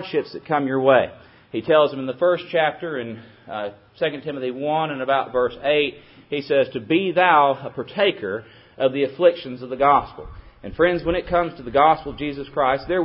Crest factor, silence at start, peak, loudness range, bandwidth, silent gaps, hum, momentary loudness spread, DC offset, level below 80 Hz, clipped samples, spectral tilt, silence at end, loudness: 18 dB; 0 s; -2 dBFS; 4 LU; 5.8 kHz; none; none; 14 LU; under 0.1%; -48 dBFS; under 0.1%; -10 dB/octave; 0 s; -21 LUFS